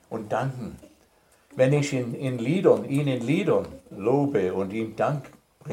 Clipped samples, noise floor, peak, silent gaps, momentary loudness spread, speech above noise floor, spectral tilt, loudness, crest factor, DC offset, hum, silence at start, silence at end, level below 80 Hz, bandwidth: under 0.1%; -61 dBFS; -6 dBFS; none; 14 LU; 36 dB; -7 dB/octave; -25 LUFS; 20 dB; under 0.1%; none; 0.1 s; 0 s; -62 dBFS; 15.5 kHz